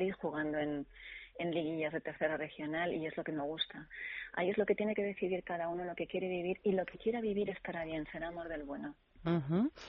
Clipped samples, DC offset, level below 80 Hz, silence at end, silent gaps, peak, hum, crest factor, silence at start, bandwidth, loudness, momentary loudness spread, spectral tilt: under 0.1%; under 0.1%; -64 dBFS; 0 s; none; -20 dBFS; none; 18 dB; 0 s; 5.6 kHz; -38 LUFS; 9 LU; -4.5 dB/octave